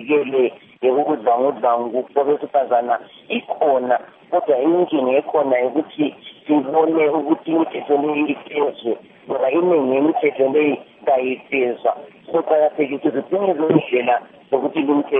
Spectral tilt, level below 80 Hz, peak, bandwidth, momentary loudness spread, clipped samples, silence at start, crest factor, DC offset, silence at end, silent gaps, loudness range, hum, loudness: -4.5 dB/octave; -70 dBFS; 0 dBFS; 3.8 kHz; 7 LU; under 0.1%; 0 s; 18 dB; under 0.1%; 0 s; none; 1 LU; none; -19 LUFS